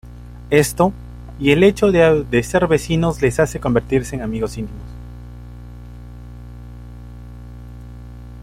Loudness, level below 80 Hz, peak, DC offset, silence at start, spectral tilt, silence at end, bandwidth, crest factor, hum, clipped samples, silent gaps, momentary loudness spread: -17 LUFS; -36 dBFS; 0 dBFS; under 0.1%; 0.05 s; -6 dB/octave; 0 s; 16.5 kHz; 18 dB; 60 Hz at -30 dBFS; under 0.1%; none; 24 LU